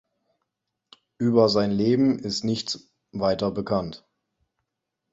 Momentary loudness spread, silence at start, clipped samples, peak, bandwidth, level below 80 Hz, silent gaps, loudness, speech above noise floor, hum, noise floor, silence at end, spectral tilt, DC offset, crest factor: 12 LU; 1.2 s; under 0.1%; -6 dBFS; 8 kHz; -56 dBFS; none; -24 LUFS; 59 dB; none; -82 dBFS; 1.15 s; -6 dB/octave; under 0.1%; 20 dB